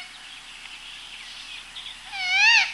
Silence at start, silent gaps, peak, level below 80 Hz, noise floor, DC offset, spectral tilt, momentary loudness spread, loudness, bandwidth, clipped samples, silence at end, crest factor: 0 s; none; -4 dBFS; -60 dBFS; -42 dBFS; under 0.1%; 3 dB/octave; 23 LU; -19 LUFS; 13 kHz; under 0.1%; 0 s; 22 dB